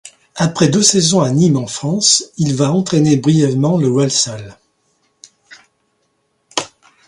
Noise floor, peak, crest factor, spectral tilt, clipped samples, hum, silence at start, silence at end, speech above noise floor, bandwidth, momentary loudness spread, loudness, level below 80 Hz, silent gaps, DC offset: -64 dBFS; 0 dBFS; 16 dB; -4.5 dB/octave; under 0.1%; none; 0.05 s; 0.4 s; 51 dB; 11.5 kHz; 12 LU; -14 LUFS; -52 dBFS; none; under 0.1%